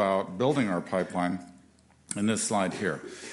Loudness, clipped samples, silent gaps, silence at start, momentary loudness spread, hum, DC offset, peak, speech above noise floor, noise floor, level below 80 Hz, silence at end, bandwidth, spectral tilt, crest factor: -29 LUFS; under 0.1%; none; 0 s; 9 LU; none; under 0.1%; -12 dBFS; 31 dB; -60 dBFS; -68 dBFS; 0 s; 11.5 kHz; -4.5 dB/octave; 18 dB